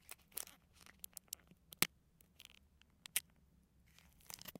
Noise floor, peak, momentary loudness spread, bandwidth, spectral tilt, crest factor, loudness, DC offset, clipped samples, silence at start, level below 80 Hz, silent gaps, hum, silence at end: -71 dBFS; -6 dBFS; 23 LU; 17 kHz; -0.5 dB/octave; 44 dB; -44 LUFS; under 0.1%; under 0.1%; 0.1 s; -74 dBFS; none; none; 0.1 s